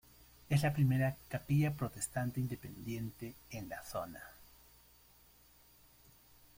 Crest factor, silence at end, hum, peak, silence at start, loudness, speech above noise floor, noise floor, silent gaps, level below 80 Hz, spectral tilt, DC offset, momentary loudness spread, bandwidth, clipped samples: 20 dB; 2.1 s; none; -20 dBFS; 0.5 s; -37 LUFS; 28 dB; -64 dBFS; none; -62 dBFS; -6.5 dB/octave; under 0.1%; 16 LU; 16.5 kHz; under 0.1%